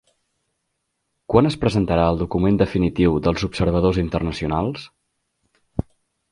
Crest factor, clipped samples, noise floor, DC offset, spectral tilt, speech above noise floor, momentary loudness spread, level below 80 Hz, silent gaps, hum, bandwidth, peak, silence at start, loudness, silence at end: 20 dB; under 0.1%; -75 dBFS; under 0.1%; -7.5 dB/octave; 56 dB; 12 LU; -36 dBFS; none; none; 11 kHz; 0 dBFS; 1.3 s; -20 LUFS; 0.5 s